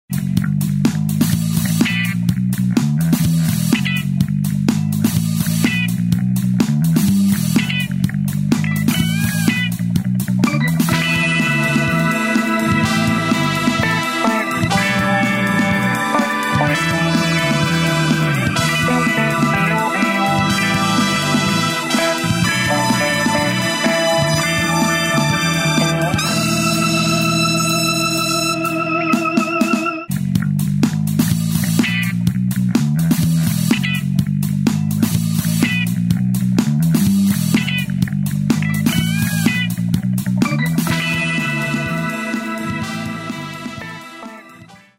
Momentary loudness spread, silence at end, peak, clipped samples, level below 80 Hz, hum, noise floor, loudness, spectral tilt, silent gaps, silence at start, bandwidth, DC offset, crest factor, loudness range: 4 LU; 0.25 s; -2 dBFS; under 0.1%; -44 dBFS; none; -42 dBFS; -17 LUFS; -5 dB/octave; none; 0.1 s; 16.5 kHz; under 0.1%; 14 dB; 2 LU